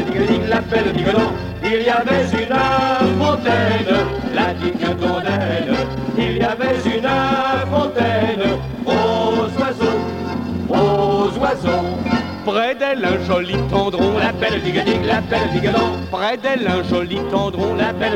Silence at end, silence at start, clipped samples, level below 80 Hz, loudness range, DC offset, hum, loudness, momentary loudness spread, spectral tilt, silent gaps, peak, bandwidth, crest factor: 0 s; 0 s; under 0.1%; -38 dBFS; 2 LU; under 0.1%; none; -18 LUFS; 4 LU; -6.5 dB/octave; none; -2 dBFS; 16 kHz; 14 dB